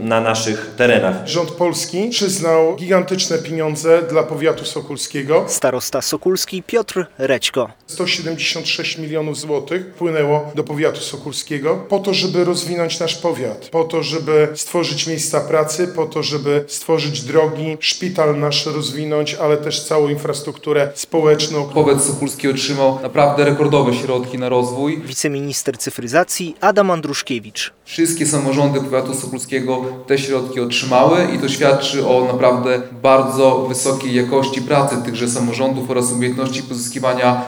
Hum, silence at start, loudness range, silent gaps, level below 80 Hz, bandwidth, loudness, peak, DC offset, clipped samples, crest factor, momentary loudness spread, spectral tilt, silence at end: none; 0 s; 4 LU; none; -62 dBFS; over 20 kHz; -17 LUFS; 0 dBFS; under 0.1%; under 0.1%; 16 dB; 8 LU; -4 dB/octave; 0 s